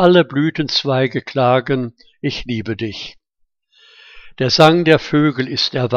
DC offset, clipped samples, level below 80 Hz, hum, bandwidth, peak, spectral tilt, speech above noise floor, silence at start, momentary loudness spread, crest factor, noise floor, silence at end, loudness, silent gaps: under 0.1%; under 0.1%; -48 dBFS; none; 12 kHz; 0 dBFS; -6 dB/octave; 50 dB; 0 s; 14 LU; 16 dB; -66 dBFS; 0 s; -16 LUFS; none